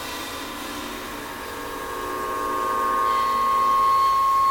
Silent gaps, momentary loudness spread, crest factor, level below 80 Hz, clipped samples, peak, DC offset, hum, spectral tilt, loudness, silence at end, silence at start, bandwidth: none; 13 LU; 12 dB; -48 dBFS; under 0.1%; -12 dBFS; under 0.1%; none; -2.5 dB/octave; -23 LUFS; 0 s; 0 s; 17.5 kHz